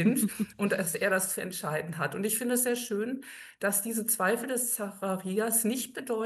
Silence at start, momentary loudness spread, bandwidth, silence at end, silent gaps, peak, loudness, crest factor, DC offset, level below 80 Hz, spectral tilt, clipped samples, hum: 0 s; 7 LU; 13 kHz; 0 s; none; -12 dBFS; -29 LUFS; 18 dB; under 0.1%; -74 dBFS; -3.5 dB/octave; under 0.1%; none